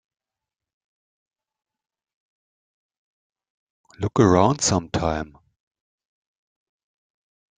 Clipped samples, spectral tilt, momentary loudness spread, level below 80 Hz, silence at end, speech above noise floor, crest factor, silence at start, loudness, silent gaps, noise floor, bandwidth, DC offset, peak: under 0.1%; -5 dB/octave; 14 LU; -50 dBFS; 2.3 s; 69 dB; 26 dB; 4 s; -21 LUFS; none; -88 dBFS; 9.6 kHz; under 0.1%; -2 dBFS